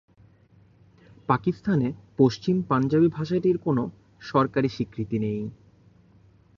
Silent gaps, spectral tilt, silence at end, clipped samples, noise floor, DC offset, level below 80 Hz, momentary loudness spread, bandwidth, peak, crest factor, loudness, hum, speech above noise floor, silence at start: none; -8.5 dB/octave; 1.05 s; under 0.1%; -57 dBFS; under 0.1%; -58 dBFS; 10 LU; 7.2 kHz; -6 dBFS; 20 dB; -25 LUFS; none; 33 dB; 1.3 s